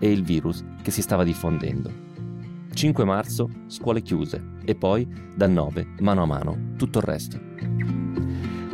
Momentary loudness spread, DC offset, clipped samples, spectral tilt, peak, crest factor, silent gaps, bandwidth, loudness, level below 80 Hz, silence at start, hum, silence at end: 10 LU; under 0.1%; under 0.1%; -6.5 dB/octave; -8 dBFS; 16 dB; none; 16 kHz; -25 LUFS; -46 dBFS; 0 s; none; 0 s